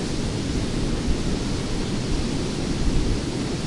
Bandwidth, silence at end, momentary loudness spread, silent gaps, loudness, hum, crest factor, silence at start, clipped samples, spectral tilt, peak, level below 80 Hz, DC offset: 11.5 kHz; 0 s; 2 LU; none; -26 LUFS; none; 14 dB; 0 s; under 0.1%; -5.5 dB/octave; -8 dBFS; -28 dBFS; under 0.1%